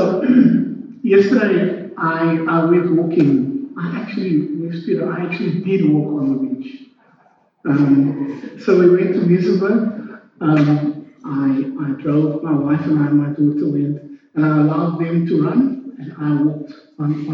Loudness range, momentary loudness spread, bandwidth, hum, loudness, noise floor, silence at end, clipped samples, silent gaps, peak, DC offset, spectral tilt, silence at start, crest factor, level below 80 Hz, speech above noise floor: 4 LU; 11 LU; 6.2 kHz; none; -17 LUFS; -55 dBFS; 0 s; under 0.1%; none; 0 dBFS; under 0.1%; -9.5 dB/octave; 0 s; 16 dB; -68 dBFS; 39 dB